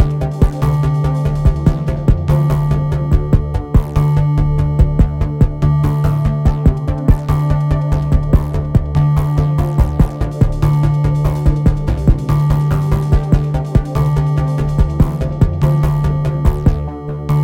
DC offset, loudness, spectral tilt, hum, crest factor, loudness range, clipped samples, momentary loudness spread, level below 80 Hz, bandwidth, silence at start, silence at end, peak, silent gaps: under 0.1%; -15 LUFS; -9 dB/octave; none; 14 dB; 1 LU; under 0.1%; 3 LU; -18 dBFS; 8.4 kHz; 0 s; 0 s; 0 dBFS; none